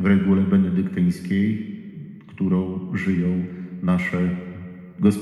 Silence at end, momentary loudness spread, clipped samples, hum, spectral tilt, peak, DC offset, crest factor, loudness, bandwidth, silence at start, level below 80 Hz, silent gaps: 0 s; 18 LU; under 0.1%; none; -8.5 dB/octave; -6 dBFS; under 0.1%; 16 dB; -22 LUFS; 12 kHz; 0 s; -52 dBFS; none